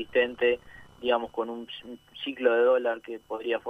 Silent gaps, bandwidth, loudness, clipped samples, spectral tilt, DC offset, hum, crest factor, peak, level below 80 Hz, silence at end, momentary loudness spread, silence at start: none; 4.6 kHz; -28 LUFS; under 0.1%; -5 dB/octave; under 0.1%; none; 18 dB; -10 dBFS; -64 dBFS; 0 s; 15 LU; 0 s